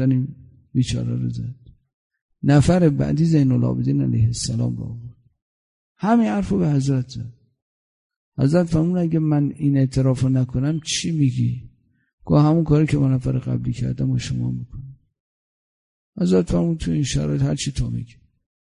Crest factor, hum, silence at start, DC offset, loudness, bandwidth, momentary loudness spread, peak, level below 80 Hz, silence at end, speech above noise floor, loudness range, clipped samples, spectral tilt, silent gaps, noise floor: 18 dB; none; 0 s; under 0.1%; -20 LUFS; 11 kHz; 14 LU; -2 dBFS; -40 dBFS; 0.7 s; over 71 dB; 5 LU; under 0.1%; -7 dB/octave; 1.93-2.10 s, 2.22-2.29 s, 5.42-5.95 s, 7.62-8.10 s, 8.16-8.32 s, 12.13-12.18 s, 15.20-16.13 s; under -90 dBFS